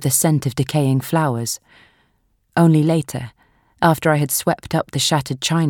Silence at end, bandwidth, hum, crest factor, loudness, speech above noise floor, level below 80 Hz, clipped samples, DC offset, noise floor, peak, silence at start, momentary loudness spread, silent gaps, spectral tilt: 0 s; 19 kHz; none; 18 dB; -18 LUFS; 46 dB; -52 dBFS; under 0.1%; under 0.1%; -63 dBFS; -2 dBFS; 0 s; 10 LU; none; -5 dB/octave